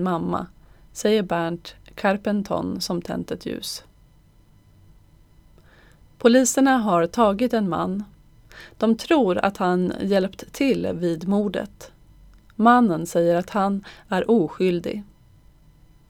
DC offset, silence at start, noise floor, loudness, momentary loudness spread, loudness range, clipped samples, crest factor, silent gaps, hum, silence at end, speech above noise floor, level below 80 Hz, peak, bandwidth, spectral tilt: under 0.1%; 0 s; -54 dBFS; -22 LUFS; 13 LU; 7 LU; under 0.1%; 20 dB; none; none; 1.05 s; 33 dB; -52 dBFS; -4 dBFS; 18 kHz; -5.5 dB/octave